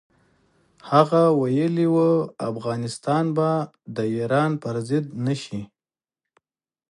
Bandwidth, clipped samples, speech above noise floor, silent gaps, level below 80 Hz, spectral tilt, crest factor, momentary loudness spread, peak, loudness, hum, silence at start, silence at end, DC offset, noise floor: 11.5 kHz; under 0.1%; over 68 dB; none; -66 dBFS; -7.5 dB/octave; 20 dB; 10 LU; -2 dBFS; -22 LUFS; none; 0.85 s; 1.25 s; under 0.1%; under -90 dBFS